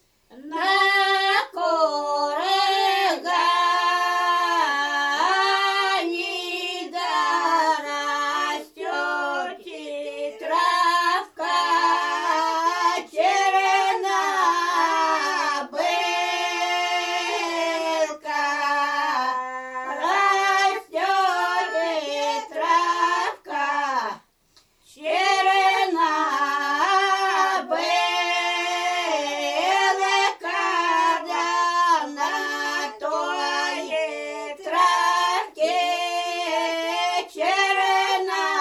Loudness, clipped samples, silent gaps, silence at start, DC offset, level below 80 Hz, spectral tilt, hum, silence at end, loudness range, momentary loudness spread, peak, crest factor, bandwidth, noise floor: -22 LUFS; under 0.1%; none; 0.3 s; under 0.1%; -72 dBFS; 0.5 dB/octave; none; 0 s; 3 LU; 7 LU; -6 dBFS; 16 dB; 13.5 kHz; -60 dBFS